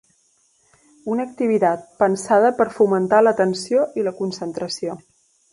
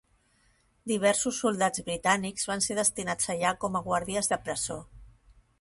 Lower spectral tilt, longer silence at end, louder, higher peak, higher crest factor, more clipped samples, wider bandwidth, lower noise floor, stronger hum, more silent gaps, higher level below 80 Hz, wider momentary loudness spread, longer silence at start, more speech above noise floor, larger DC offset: first, -5.5 dB/octave vs -3 dB/octave; about the same, 0.55 s vs 0.55 s; first, -20 LUFS vs -28 LUFS; first, -2 dBFS vs -8 dBFS; about the same, 18 dB vs 22 dB; neither; about the same, 11.5 kHz vs 12 kHz; second, -62 dBFS vs -67 dBFS; neither; neither; second, -64 dBFS vs -58 dBFS; first, 12 LU vs 7 LU; first, 1.05 s vs 0.85 s; first, 43 dB vs 38 dB; neither